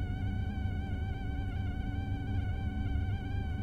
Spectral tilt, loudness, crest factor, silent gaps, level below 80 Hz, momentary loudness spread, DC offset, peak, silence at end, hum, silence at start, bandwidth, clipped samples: -8.5 dB/octave; -36 LUFS; 12 dB; none; -38 dBFS; 2 LU; under 0.1%; -22 dBFS; 0 s; none; 0 s; 6.4 kHz; under 0.1%